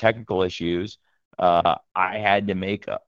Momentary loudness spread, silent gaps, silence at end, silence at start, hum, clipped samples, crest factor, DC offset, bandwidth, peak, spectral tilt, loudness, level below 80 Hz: 9 LU; 1.25-1.31 s; 0.1 s; 0 s; none; under 0.1%; 20 dB; under 0.1%; 7.4 kHz; -2 dBFS; -6.5 dB/octave; -23 LUFS; -56 dBFS